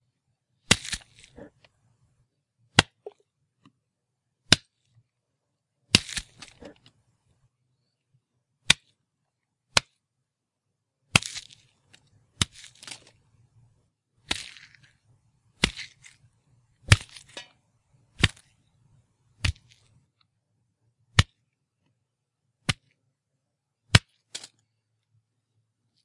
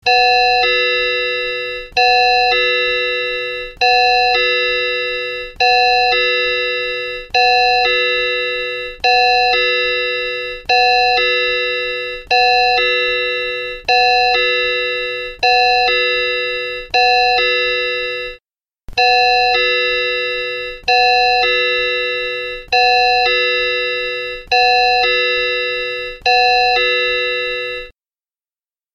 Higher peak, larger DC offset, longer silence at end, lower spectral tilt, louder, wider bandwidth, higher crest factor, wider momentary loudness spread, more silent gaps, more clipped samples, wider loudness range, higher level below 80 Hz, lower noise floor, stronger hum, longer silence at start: about the same, 0 dBFS vs -2 dBFS; neither; first, 1.7 s vs 1.05 s; about the same, -2.5 dB/octave vs -1.5 dB/octave; second, -25 LUFS vs -14 LUFS; first, 12 kHz vs 7.8 kHz; first, 32 dB vs 14 dB; first, 21 LU vs 9 LU; neither; neither; first, 7 LU vs 1 LU; second, -48 dBFS vs -42 dBFS; second, -83 dBFS vs under -90 dBFS; neither; first, 0.7 s vs 0.05 s